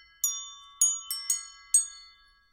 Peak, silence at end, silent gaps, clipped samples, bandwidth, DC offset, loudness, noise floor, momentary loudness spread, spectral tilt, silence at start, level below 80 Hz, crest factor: -10 dBFS; 0.45 s; none; under 0.1%; 16 kHz; under 0.1%; -27 LUFS; -57 dBFS; 13 LU; 6 dB/octave; 0.25 s; -70 dBFS; 22 dB